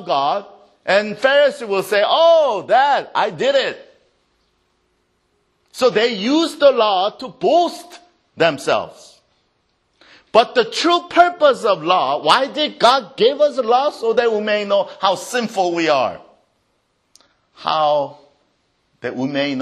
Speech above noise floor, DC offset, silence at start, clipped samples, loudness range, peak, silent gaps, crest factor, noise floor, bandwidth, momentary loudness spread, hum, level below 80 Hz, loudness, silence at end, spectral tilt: 49 dB; under 0.1%; 0 s; under 0.1%; 6 LU; 0 dBFS; none; 18 dB; -66 dBFS; 13 kHz; 9 LU; none; -66 dBFS; -16 LUFS; 0 s; -3.5 dB/octave